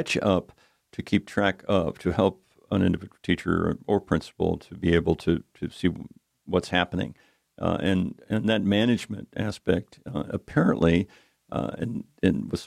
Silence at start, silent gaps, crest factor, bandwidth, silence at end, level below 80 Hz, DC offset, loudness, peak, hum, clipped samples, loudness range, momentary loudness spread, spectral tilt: 0 s; none; 20 dB; 13 kHz; 0 s; -48 dBFS; under 0.1%; -26 LUFS; -6 dBFS; none; under 0.1%; 2 LU; 10 LU; -6.5 dB/octave